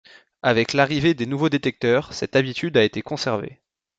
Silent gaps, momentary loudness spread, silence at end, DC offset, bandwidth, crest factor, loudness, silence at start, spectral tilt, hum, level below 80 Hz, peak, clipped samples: none; 7 LU; 0.45 s; under 0.1%; 8.8 kHz; 18 dB; -21 LUFS; 0.45 s; -5.5 dB/octave; none; -56 dBFS; -4 dBFS; under 0.1%